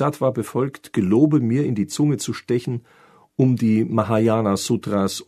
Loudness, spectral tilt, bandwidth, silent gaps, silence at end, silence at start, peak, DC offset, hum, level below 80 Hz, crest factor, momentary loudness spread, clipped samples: -20 LUFS; -6.5 dB/octave; 13.5 kHz; none; 0.05 s; 0 s; -2 dBFS; under 0.1%; none; -60 dBFS; 18 dB; 8 LU; under 0.1%